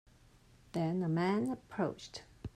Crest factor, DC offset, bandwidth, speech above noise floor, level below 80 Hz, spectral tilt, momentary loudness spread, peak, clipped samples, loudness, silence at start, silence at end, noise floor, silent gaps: 16 dB; under 0.1%; 10.5 kHz; 28 dB; -64 dBFS; -7 dB/octave; 15 LU; -20 dBFS; under 0.1%; -36 LUFS; 0.75 s; 0.05 s; -63 dBFS; none